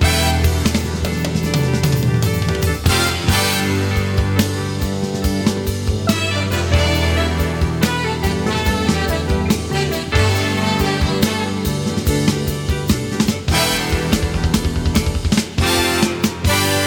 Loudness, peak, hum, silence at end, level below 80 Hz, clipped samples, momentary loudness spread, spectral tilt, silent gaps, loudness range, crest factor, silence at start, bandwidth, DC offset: -18 LUFS; 0 dBFS; none; 0 s; -26 dBFS; under 0.1%; 4 LU; -4.5 dB/octave; none; 1 LU; 16 dB; 0 s; 18 kHz; under 0.1%